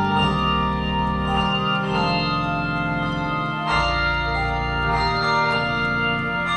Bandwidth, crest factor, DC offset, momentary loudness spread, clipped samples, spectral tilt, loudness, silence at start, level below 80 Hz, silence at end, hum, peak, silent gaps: 11 kHz; 14 dB; under 0.1%; 4 LU; under 0.1%; -6 dB/octave; -21 LUFS; 0 s; -34 dBFS; 0 s; none; -6 dBFS; none